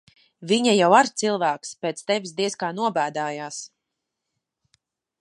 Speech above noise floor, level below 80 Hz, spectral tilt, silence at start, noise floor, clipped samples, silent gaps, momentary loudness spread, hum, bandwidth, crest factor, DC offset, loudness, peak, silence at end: 60 dB; -76 dBFS; -3.5 dB/octave; 0.4 s; -82 dBFS; under 0.1%; none; 16 LU; none; 11.5 kHz; 22 dB; under 0.1%; -22 LUFS; -2 dBFS; 1.55 s